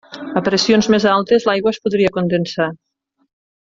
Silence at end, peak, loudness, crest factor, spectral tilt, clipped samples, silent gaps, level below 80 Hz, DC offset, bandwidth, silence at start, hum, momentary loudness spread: 0.85 s; -2 dBFS; -16 LUFS; 14 dB; -5 dB/octave; under 0.1%; none; -54 dBFS; under 0.1%; 7.8 kHz; 0.1 s; none; 8 LU